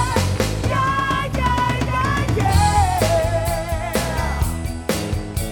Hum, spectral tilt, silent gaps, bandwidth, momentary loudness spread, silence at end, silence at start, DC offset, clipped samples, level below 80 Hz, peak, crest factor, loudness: none; -5 dB/octave; none; 18 kHz; 7 LU; 0 s; 0 s; under 0.1%; under 0.1%; -26 dBFS; -2 dBFS; 16 dB; -20 LUFS